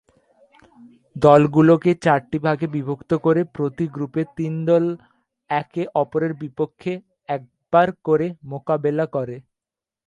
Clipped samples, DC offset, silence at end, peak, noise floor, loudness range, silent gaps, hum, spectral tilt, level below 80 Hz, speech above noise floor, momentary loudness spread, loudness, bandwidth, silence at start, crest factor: under 0.1%; under 0.1%; 0.65 s; 0 dBFS; -89 dBFS; 6 LU; none; none; -8.5 dB/octave; -58 dBFS; 69 dB; 15 LU; -20 LUFS; 9.6 kHz; 1.15 s; 20 dB